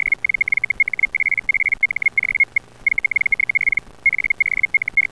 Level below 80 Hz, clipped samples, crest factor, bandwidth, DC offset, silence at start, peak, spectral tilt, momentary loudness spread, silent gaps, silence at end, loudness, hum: -48 dBFS; under 0.1%; 12 dB; 11 kHz; 0.3%; 0.05 s; -8 dBFS; -3 dB/octave; 2 LU; none; 0.1 s; -17 LUFS; none